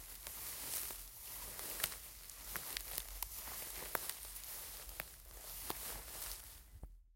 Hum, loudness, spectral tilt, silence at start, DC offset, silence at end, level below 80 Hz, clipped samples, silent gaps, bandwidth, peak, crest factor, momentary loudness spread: none; -44 LUFS; -0.5 dB/octave; 0 s; under 0.1%; 0 s; -58 dBFS; under 0.1%; none; 17 kHz; -16 dBFS; 32 dB; 9 LU